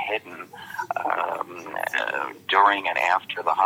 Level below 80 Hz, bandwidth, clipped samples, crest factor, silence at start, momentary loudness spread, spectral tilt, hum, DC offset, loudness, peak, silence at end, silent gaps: -80 dBFS; 17 kHz; under 0.1%; 20 dB; 0 s; 15 LU; -2.5 dB/octave; none; under 0.1%; -24 LUFS; -4 dBFS; 0 s; none